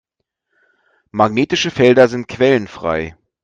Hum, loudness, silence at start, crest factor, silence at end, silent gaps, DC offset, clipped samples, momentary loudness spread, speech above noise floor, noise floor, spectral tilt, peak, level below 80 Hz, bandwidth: none; -15 LUFS; 1.15 s; 16 dB; 0.3 s; none; under 0.1%; under 0.1%; 12 LU; 59 dB; -73 dBFS; -5.5 dB/octave; 0 dBFS; -50 dBFS; 7.8 kHz